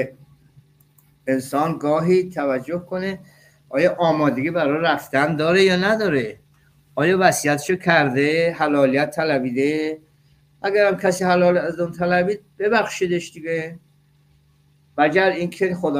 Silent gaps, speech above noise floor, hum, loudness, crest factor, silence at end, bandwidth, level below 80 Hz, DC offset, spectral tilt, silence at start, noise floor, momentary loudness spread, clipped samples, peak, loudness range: none; 38 dB; none; -20 LUFS; 18 dB; 0 s; 16 kHz; -60 dBFS; under 0.1%; -5.5 dB/octave; 0 s; -58 dBFS; 10 LU; under 0.1%; -2 dBFS; 5 LU